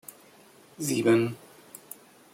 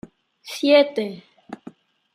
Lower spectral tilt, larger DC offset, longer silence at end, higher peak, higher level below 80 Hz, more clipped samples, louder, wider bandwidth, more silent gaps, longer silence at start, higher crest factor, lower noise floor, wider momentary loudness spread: about the same, -5 dB/octave vs -4 dB/octave; neither; first, 0.95 s vs 0.6 s; second, -10 dBFS vs -4 dBFS; about the same, -72 dBFS vs -70 dBFS; neither; second, -26 LUFS vs -19 LUFS; first, 16.5 kHz vs 14.5 kHz; neither; first, 0.8 s vs 0.45 s; about the same, 20 dB vs 20 dB; first, -55 dBFS vs -46 dBFS; about the same, 24 LU vs 25 LU